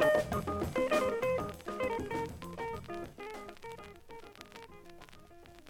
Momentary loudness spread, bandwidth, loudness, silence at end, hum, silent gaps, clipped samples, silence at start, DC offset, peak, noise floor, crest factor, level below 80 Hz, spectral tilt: 23 LU; 17.5 kHz; -35 LUFS; 0 s; none; none; under 0.1%; 0 s; under 0.1%; -16 dBFS; -55 dBFS; 20 dB; -56 dBFS; -5.5 dB/octave